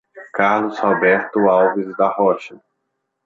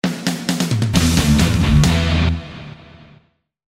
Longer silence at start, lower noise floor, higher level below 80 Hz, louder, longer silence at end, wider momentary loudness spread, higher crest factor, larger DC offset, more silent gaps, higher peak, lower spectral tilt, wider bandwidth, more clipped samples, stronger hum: about the same, 0.15 s vs 0.05 s; first, -74 dBFS vs -54 dBFS; second, -64 dBFS vs -28 dBFS; about the same, -17 LUFS vs -16 LUFS; second, 0.7 s vs 1 s; second, 9 LU vs 15 LU; about the same, 16 dB vs 18 dB; neither; neither; about the same, -2 dBFS vs 0 dBFS; first, -7 dB/octave vs -5 dB/octave; second, 7.4 kHz vs 16 kHz; neither; neither